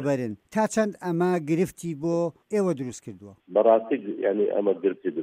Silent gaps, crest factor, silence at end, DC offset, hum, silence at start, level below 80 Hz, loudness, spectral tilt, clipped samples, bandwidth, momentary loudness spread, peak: none; 18 dB; 0 s; under 0.1%; none; 0 s; -66 dBFS; -25 LUFS; -7 dB/octave; under 0.1%; 15.5 kHz; 9 LU; -6 dBFS